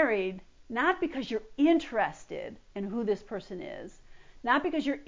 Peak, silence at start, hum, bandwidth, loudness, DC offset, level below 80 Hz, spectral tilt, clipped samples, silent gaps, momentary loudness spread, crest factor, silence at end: -14 dBFS; 0 s; none; 7.6 kHz; -31 LUFS; under 0.1%; -60 dBFS; -5.5 dB/octave; under 0.1%; none; 15 LU; 18 dB; 0 s